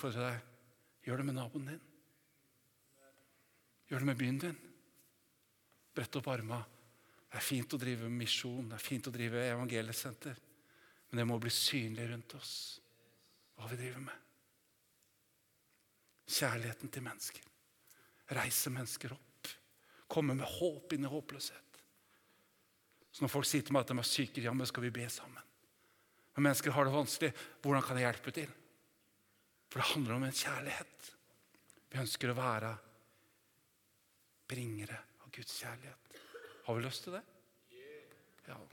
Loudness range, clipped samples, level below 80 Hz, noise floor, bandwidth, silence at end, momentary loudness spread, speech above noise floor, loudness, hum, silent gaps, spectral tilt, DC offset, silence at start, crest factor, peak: 10 LU; under 0.1%; -80 dBFS; -76 dBFS; 19 kHz; 0.05 s; 20 LU; 37 dB; -39 LUFS; none; none; -4 dB/octave; under 0.1%; 0 s; 26 dB; -16 dBFS